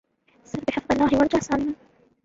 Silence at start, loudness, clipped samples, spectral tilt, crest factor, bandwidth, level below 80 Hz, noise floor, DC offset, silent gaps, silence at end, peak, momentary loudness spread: 0.55 s; -23 LUFS; under 0.1%; -5.5 dB/octave; 18 dB; 7.8 kHz; -48 dBFS; -55 dBFS; under 0.1%; none; 0.5 s; -6 dBFS; 14 LU